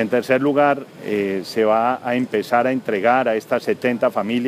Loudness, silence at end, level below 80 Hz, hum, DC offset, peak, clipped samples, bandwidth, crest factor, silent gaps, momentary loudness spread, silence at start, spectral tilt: -19 LUFS; 0 s; -72 dBFS; none; under 0.1%; -2 dBFS; under 0.1%; 15.5 kHz; 16 dB; none; 5 LU; 0 s; -6 dB/octave